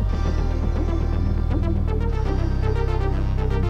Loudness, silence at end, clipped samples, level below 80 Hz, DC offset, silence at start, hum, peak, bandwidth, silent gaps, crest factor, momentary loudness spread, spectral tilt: -24 LUFS; 0 s; under 0.1%; -22 dBFS; under 0.1%; 0 s; none; -10 dBFS; 6.8 kHz; none; 10 dB; 1 LU; -8.5 dB/octave